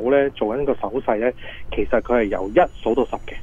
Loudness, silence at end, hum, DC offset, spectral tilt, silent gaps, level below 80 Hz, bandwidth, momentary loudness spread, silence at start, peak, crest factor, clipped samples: -21 LUFS; 0 s; none; under 0.1%; -7.5 dB/octave; none; -38 dBFS; 7.2 kHz; 8 LU; 0 s; -4 dBFS; 16 dB; under 0.1%